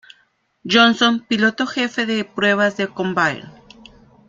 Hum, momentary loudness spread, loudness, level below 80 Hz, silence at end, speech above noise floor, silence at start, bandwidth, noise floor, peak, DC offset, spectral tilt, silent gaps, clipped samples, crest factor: none; 8 LU; -17 LUFS; -60 dBFS; 0.8 s; 44 dB; 0.65 s; 7.6 kHz; -62 dBFS; 0 dBFS; under 0.1%; -4 dB/octave; none; under 0.1%; 18 dB